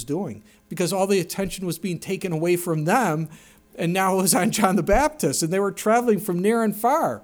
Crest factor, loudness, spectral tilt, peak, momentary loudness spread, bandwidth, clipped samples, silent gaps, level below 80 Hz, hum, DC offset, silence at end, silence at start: 18 dB; -22 LUFS; -4.5 dB/octave; -4 dBFS; 10 LU; over 20 kHz; under 0.1%; none; -42 dBFS; none; under 0.1%; 0.05 s; 0 s